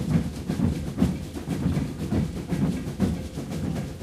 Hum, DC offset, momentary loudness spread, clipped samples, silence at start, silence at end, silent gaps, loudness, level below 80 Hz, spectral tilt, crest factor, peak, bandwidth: none; under 0.1%; 5 LU; under 0.1%; 0 s; 0 s; none; -28 LUFS; -38 dBFS; -7.5 dB/octave; 18 dB; -10 dBFS; 15.5 kHz